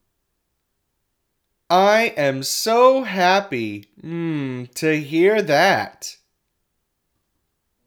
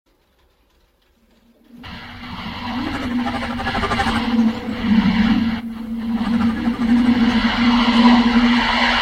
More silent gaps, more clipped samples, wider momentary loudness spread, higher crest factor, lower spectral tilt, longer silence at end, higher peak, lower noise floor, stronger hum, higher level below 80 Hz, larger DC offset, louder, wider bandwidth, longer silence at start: neither; neither; about the same, 15 LU vs 15 LU; about the same, 18 dB vs 18 dB; second, -4 dB/octave vs -5.5 dB/octave; first, 1.75 s vs 0 s; about the same, -2 dBFS vs 0 dBFS; first, -74 dBFS vs -59 dBFS; neither; second, -72 dBFS vs -36 dBFS; neither; about the same, -18 LUFS vs -17 LUFS; first, over 20 kHz vs 9.2 kHz; about the same, 1.7 s vs 1.75 s